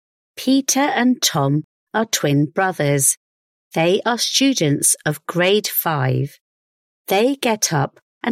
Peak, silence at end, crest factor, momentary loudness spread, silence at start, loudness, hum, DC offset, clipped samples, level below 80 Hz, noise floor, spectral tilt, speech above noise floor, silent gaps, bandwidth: -4 dBFS; 0 s; 16 dB; 9 LU; 0.35 s; -18 LUFS; none; under 0.1%; under 0.1%; -62 dBFS; under -90 dBFS; -3.5 dB/octave; over 72 dB; 1.64-1.87 s, 3.17-3.71 s, 6.41-7.05 s, 8.02-8.21 s; 16 kHz